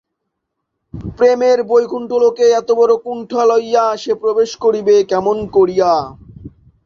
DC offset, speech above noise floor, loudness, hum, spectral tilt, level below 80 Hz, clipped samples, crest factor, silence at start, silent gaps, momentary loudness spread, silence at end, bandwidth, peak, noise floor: under 0.1%; 61 dB; -14 LUFS; none; -5 dB/octave; -48 dBFS; under 0.1%; 14 dB; 0.95 s; none; 6 LU; 0.35 s; 7.2 kHz; -2 dBFS; -75 dBFS